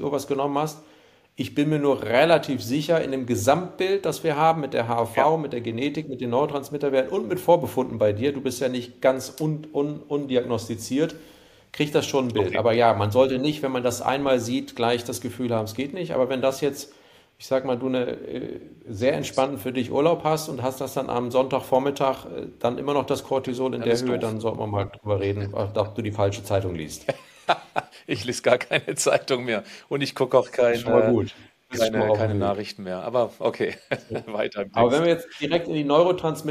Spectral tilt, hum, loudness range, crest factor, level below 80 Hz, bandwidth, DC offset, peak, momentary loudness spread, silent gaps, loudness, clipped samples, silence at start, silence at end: -5.5 dB/octave; none; 4 LU; 18 dB; -60 dBFS; 15.5 kHz; under 0.1%; -4 dBFS; 10 LU; none; -24 LUFS; under 0.1%; 0 s; 0 s